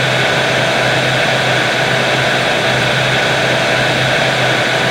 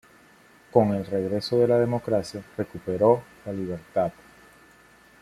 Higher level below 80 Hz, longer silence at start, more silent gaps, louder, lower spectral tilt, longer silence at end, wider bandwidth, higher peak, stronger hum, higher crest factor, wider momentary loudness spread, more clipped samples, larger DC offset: first, -42 dBFS vs -60 dBFS; second, 0 s vs 0.75 s; neither; first, -12 LUFS vs -25 LUFS; second, -3.5 dB/octave vs -7.5 dB/octave; second, 0 s vs 1.1 s; first, 16.5 kHz vs 13.5 kHz; about the same, 0 dBFS vs -2 dBFS; neither; second, 12 dB vs 22 dB; second, 0 LU vs 12 LU; neither; neither